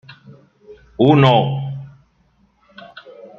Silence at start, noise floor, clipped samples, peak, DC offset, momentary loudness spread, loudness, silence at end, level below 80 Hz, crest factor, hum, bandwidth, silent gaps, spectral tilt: 0.1 s; -59 dBFS; under 0.1%; -2 dBFS; under 0.1%; 27 LU; -15 LUFS; 0.15 s; -54 dBFS; 18 dB; none; 6.2 kHz; none; -8.5 dB/octave